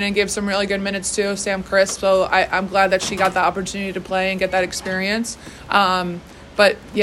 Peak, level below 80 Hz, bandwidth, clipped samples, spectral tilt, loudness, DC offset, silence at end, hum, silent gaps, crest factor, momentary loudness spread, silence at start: -2 dBFS; -46 dBFS; 13.5 kHz; under 0.1%; -3.5 dB/octave; -19 LUFS; under 0.1%; 0 s; none; none; 18 dB; 8 LU; 0 s